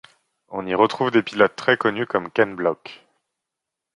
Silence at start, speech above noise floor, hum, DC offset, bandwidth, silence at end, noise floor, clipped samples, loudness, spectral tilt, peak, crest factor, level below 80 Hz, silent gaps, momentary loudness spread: 0.5 s; 64 dB; none; under 0.1%; 11 kHz; 1 s; -84 dBFS; under 0.1%; -20 LUFS; -6 dB/octave; -2 dBFS; 22 dB; -64 dBFS; none; 15 LU